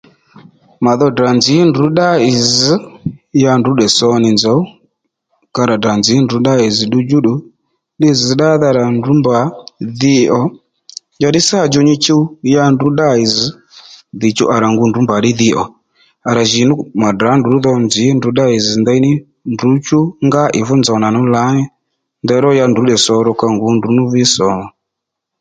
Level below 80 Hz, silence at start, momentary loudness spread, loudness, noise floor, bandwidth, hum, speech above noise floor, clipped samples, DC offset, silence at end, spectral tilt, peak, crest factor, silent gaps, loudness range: -50 dBFS; 0.8 s; 8 LU; -12 LUFS; -77 dBFS; 9.4 kHz; none; 66 dB; under 0.1%; under 0.1%; 0.7 s; -5 dB/octave; 0 dBFS; 12 dB; none; 2 LU